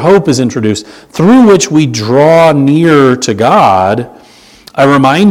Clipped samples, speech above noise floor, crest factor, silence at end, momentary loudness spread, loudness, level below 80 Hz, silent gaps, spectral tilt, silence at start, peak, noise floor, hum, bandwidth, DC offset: 3%; 30 dB; 8 dB; 0 s; 10 LU; -7 LUFS; -46 dBFS; none; -5.5 dB/octave; 0 s; 0 dBFS; -37 dBFS; none; 15.5 kHz; under 0.1%